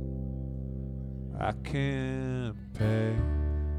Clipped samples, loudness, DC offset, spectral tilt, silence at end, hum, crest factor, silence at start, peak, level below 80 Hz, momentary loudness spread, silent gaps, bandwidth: under 0.1%; -33 LUFS; under 0.1%; -8 dB/octave; 0 s; none; 14 dB; 0 s; -18 dBFS; -36 dBFS; 9 LU; none; 10 kHz